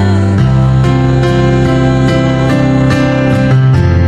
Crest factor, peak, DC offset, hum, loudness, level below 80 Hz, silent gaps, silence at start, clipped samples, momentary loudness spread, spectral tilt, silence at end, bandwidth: 8 dB; 0 dBFS; under 0.1%; none; -9 LUFS; -22 dBFS; none; 0 s; under 0.1%; 2 LU; -8 dB/octave; 0 s; 8.6 kHz